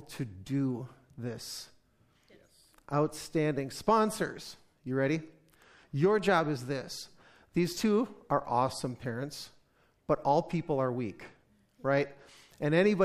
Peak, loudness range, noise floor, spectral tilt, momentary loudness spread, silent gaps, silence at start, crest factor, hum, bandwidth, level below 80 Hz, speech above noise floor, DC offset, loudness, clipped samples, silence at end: -12 dBFS; 4 LU; -68 dBFS; -6 dB/octave; 17 LU; none; 0 s; 20 dB; none; 15 kHz; -64 dBFS; 38 dB; under 0.1%; -32 LUFS; under 0.1%; 0 s